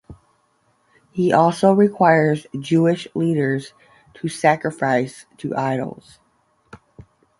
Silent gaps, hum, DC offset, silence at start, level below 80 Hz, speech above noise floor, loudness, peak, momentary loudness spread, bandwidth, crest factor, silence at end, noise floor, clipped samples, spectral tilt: none; none; under 0.1%; 0.1 s; -60 dBFS; 45 dB; -19 LUFS; -2 dBFS; 14 LU; 11.5 kHz; 18 dB; 0.4 s; -63 dBFS; under 0.1%; -7 dB/octave